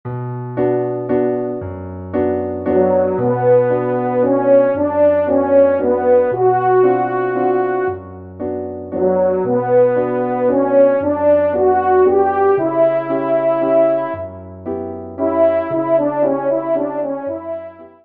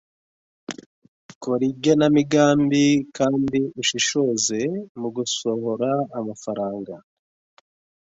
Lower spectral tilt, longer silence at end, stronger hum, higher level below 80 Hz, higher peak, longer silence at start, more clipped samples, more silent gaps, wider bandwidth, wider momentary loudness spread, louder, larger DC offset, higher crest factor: first, -12 dB/octave vs -4.5 dB/octave; second, 0.15 s vs 1.05 s; neither; about the same, -60 dBFS vs -60 dBFS; first, -2 dBFS vs -6 dBFS; second, 0.05 s vs 0.7 s; neither; second, none vs 0.86-1.02 s, 1.08-1.29 s, 1.35-1.41 s, 4.89-4.95 s; second, 3.8 kHz vs 8 kHz; second, 12 LU vs 19 LU; first, -16 LUFS vs -21 LUFS; first, 0.2% vs under 0.1%; about the same, 14 dB vs 18 dB